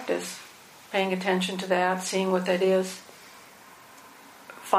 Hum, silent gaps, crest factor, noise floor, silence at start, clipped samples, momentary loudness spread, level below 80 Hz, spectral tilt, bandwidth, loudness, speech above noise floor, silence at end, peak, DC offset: none; none; 24 dB; -50 dBFS; 0 s; under 0.1%; 24 LU; -78 dBFS; -4.5 dB/octave; 15.5 kHz; -26 LUFS; 24 dB; 0 s; -4 dBFS; under 0.1%